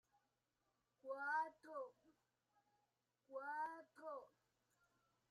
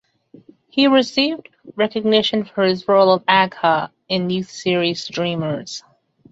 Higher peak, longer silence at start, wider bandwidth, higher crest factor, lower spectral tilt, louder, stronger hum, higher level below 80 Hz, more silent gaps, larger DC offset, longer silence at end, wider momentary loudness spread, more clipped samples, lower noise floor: second, -32 dBFS vs -2 dBFS; first, 1.05 s vs 0.75 s; first, 12.5 kHz vs 8 kHz; about the same, 20 dB vs 18 dB; second, -3.5 dB/octave vs -5 dB/octave; second, -50 LUFS vs -18 LUFS; neither; second, under -90 dBFS vs -62 dBFS; neither; neither; first, 1 s vs 0.5 s; about the same, 13 LU vs 11 LU; neither; first, -89 dBFS vs -48 dBFS